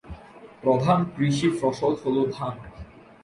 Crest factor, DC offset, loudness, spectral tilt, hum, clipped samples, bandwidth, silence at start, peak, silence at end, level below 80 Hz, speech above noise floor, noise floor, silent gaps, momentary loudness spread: 18 dB; under 0.1%; -24 LUFS; -7 dB/octave; none; under 0.1%; 11.5 kHz; 0.05 s; -6 dBFS; 0.4 s; -52 dBFS; 23 dB; -46 dBFS; none; 22 LU